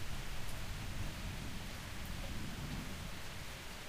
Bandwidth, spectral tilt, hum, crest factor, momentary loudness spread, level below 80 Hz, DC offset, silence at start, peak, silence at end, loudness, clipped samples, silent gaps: 15.5 kHz; -4 dB/octave; none; 14 dB; 3 LU; -48 dBFS; under 0.1%; 0 s; -28 dBFS; 0 s; -45 LUFS; under 0.1%; none